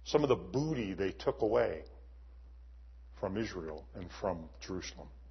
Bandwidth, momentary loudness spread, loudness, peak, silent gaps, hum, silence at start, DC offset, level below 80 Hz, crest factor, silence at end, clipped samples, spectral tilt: 6.2 kHz; 25 LU; -36 LUFS; -16 dBFS; none; none; 0 s; under 0.1%; -52 dBFS; 22 dB; 0 s; under 0.1%; -5.5 dB/octave